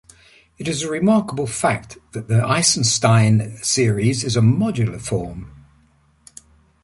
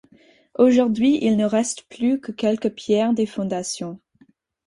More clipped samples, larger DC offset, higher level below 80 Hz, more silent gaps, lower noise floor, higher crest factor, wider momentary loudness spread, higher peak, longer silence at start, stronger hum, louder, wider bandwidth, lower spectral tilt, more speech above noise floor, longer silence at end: neither; neither; first, -48 dBFS vs -60 dBFS; neither; about the same, -57 dBFS vs -58 dBFS; about the same, 18 dB vs 18 dB; about the same, 12 LU vs 11 LU; about the same, -2 dBFS vs -4 dBFS; about the same, 0.6 s vs 0.6 s; neither; first, -18 LUFS vs -21 LUFS; about the same, 11.5 kHz vs 11.5 kHz; about the same, -4.5 dB/octave vs -5 dB/octave; about the same, 39 dB vs 38 dB; first, 1.35 s vs 0.7 s